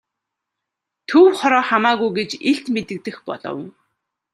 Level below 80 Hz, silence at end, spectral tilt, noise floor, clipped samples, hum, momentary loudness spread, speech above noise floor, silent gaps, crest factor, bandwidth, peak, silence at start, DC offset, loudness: -66 dBFS; 0.65 s; -5 dB/octave; -82 dBFS; under 0.1%; none; 17 LU; 64 dB; none; 18 dB; 12 kHz; -2 dBFS; 1.1 s; under 0.1%; -17 LUFS